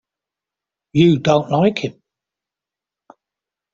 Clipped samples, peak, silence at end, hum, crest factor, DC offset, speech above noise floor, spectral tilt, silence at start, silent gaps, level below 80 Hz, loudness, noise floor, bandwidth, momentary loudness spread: under 0.1%; -2 dBFS; 1.85 s; 50 Hz at -50 dBFS; 18 dB; under 0.1%; 73 dB; -7 dB/octave; 0.95 s; none; -56 dBFS; -16 LUFS; -87 dBFS; 7.6 kHz; 12 LU